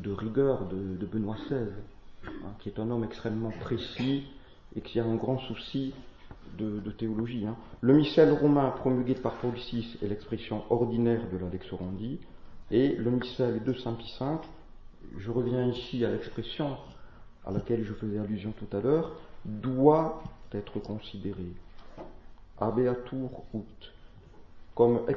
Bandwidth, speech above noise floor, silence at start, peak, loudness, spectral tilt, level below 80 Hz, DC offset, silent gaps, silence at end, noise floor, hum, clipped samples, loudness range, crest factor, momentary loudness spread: 6.6 kHz; 20 dB; 0 s; -8 dBFS; -30 LUFS; -9 dB/octave; -50 dBFS; under 0.1%; none; 0 s; -50 dBFS; none; under 0.1%; 8 LU; 24 dB; 18 LU